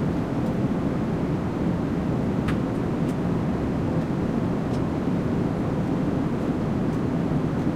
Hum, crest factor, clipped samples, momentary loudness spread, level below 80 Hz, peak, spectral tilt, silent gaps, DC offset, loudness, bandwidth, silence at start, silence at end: none; 14 dB; under 0.1%; 1 LU; -40 dBFS; -10 dBFS; -8.5 dB/octave; none; under 0.1%; -25 LUFS; 12.5 kHz; 0 s; 0 s